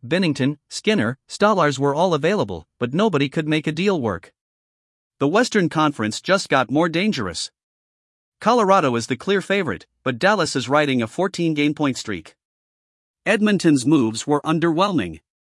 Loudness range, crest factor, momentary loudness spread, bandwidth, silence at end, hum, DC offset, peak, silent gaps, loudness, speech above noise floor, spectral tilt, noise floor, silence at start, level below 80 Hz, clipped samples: 2 LU; 18 dB; 10 LU; 12 kHz; 0.25 s; none; under 0.1%; -2 dBFS; 4.41-5.10 s, 7.63-8.32 s, 12.45-13.14 s; -20 LUFS; over 70 dB; -5 dB/octave; under -90 dBFS; 0.05 s; -62 dBFS; under 0.1%